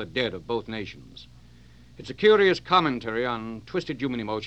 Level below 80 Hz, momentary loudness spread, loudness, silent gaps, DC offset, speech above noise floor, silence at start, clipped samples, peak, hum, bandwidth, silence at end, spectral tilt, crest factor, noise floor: -56 dBFS; 18 LU; -25 LUFS; none; 0.2%; 26 dB; 0 s; under 0.1%; -6 dBFS; none; 8.4 kHz; 0 s; -6 dB/octave; 20 dB; -52 dBFS